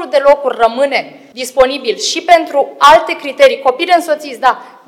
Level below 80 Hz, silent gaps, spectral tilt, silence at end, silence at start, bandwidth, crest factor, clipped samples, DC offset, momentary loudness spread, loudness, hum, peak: -46 dBFS; none; -1.5 dB/octave; 0.2 s; 0 s; 16.5 kHz; 12 dB; 1%; under 0.1%; 11 LU; -11 LUFS; none; 0 dBFS